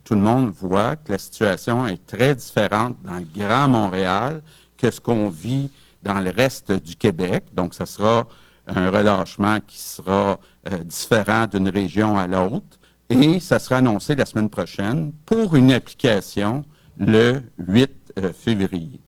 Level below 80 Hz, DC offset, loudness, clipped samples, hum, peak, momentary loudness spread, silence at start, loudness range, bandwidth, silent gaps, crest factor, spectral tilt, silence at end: -48 dBFS; under 0.1%; -20 LUFS; under 0.1%; none; -2 dBFS; 11 LU; 0.1 s; 4 LU; 18.5 kHz; none; 18 dB; -6 dB/octave; 0.1 s